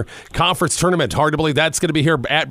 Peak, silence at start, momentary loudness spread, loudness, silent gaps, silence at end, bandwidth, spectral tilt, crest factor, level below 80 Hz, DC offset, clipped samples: -2 dBFS; 0 s; 2 LU; -17 LUFS; none; 0 s; 16 kHz; -4 dB/octave; 16 dB; -40 dBFS; under 0.1%; under 0.1%